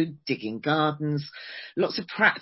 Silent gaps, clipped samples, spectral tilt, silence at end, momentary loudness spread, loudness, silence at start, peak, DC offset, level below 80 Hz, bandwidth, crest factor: none; under 0.1%; -9 dB/octave; 0 s; 12 LU; -27 LUFS; 0 s; -6 dBFS; under 0.1%; -70 dBFS; 5.8 kHz; 20 dB